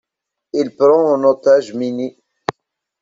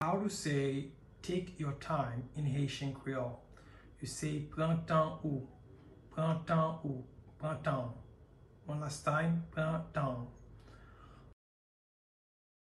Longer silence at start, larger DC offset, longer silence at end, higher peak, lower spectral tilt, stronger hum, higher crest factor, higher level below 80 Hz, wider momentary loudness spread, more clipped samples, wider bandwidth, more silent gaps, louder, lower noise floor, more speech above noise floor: first, 0.55 s vs 0 s; neither; second, 0.5 s vs 1.3 s; first, 0 dBFS vs -20 dBFS; about the same, -6 dB/octave vs -6.5 dB/octave; neither; about the same, 16 dB vs 18 dB; about the same, -64 dBFS vs -60 dBFS; second, 15 LU vs 22 LU; neither; second, 7.6 kHz vs 12 kHz; neither; first, -15 LUFS vs -37 LUFS; first, -81 dBFS vs -60 dBFS; first, 67 dB vs 24 dB